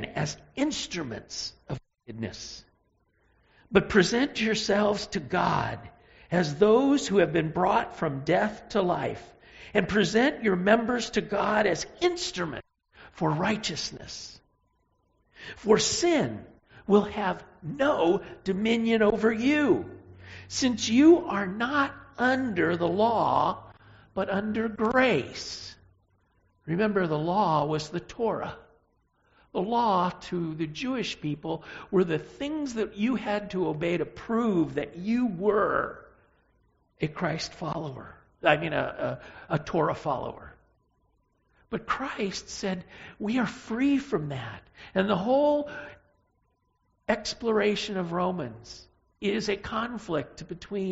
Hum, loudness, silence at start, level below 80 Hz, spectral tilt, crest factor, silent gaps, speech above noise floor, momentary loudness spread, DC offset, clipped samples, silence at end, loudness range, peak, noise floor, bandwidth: none; -27 LUFS; 0 s; -56 dBFS; -4 dB/octave; 22 dB; none; 46 dB; 16 LU; under 0.1%; under 0.1%; 0 s; 6 LU; -6 dBFS; -72 dBFS; 8 kHz